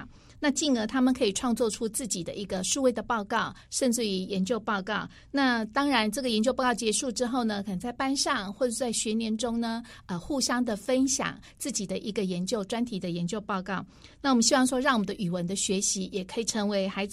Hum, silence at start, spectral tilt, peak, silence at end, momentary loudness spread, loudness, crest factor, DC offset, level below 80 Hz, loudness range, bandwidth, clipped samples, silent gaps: none; 0 s; -3.5 dB/octave; -10 dBFS; 0 s; 7 LU; -28 LUFS; 20 dB; under 0.1%; -56 dBFS; 3 LU; 15 kHz; under 0.1%; none